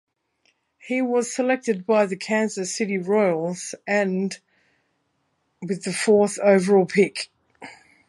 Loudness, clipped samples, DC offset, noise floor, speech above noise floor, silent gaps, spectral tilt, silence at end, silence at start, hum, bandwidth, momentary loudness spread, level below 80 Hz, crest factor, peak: -22 LUFS; under 0.1%; under 0.1%; -71 dBFS; 50 dB; none; -5 dB/octave; 0.35 s; 0.85 s; none; 11.5 kHz; 14 LU; -72 dBFS; 20 dB; -4 dBFS